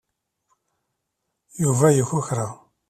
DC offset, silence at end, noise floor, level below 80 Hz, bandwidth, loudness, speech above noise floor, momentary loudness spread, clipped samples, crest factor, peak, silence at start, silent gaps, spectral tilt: under 0.1%; 0.35 s; -79 dBFS; -60 dBFS; 15 kHz; -21 LUFS; 59 dB; 14 LU; under 0.1%; 20 dB; -4 dBFS; 1.55 s; none; -6.5 dB/octave